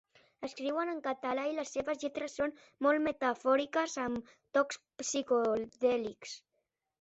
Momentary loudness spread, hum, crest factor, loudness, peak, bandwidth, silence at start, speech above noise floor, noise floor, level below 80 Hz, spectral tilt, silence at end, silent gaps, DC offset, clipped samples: 11 LU; none; 18 dB; -34 LUFS; -16 dBFS; 8.2 kHz; 0.4 s; 50 dB; -83 dBFS; -72 dBFS; -3 dB/octave; 0.65 s; none; under 0.1%; under 0.1%